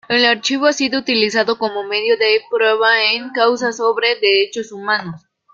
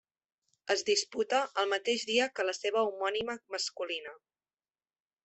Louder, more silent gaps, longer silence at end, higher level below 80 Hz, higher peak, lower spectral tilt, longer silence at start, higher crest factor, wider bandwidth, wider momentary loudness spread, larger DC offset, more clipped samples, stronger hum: first, -15 LUFS vs -32 LUFS; neither; second, 0.35 s vs 1.1 s; first, -64 dBFS vs -76 dBFS; first, -2 dBFS vs -14 dBFS; first, -2.5 dB/octave vs -1 dB/octave; second, 0.1 s vs 0.65 s; about the same, 16 dB vs 20 dB; about the same, 7.8 kHz vs 8.4 kHz; about the same, 7 LU vs 8 LU; neither; neither; neither